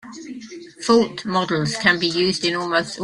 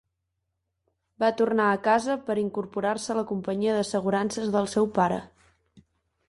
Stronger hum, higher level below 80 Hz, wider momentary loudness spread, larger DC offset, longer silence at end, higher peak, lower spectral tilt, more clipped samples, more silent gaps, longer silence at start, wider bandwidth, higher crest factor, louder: neither; first, -58 dBFS vs -64 dBFS; first, 18 LU vs 6 LU; neither; second, 0 s vs 0.5 s; first, -2 dBFS vs -10 dBFS; second, -4 dB/octave vs -5.5 dB/octave; neither; neither; second, 0.05 s vs 1.2 s; about the same, 11.5 kHz vs 11.5 kHz; about the same, 18 dB vs 18 dB; first, -19 LUFS vs -26 LUFS